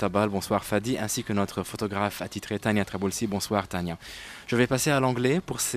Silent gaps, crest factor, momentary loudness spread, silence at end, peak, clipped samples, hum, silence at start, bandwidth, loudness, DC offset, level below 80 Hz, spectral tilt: none; 20 dB; 9 LU; 0 s; -8 dBFS; under 0.1%; none; 0 s; 15.5 kHz; -27 LUFS; under 0.1%; -54 dBFS; -4.5 dB/octave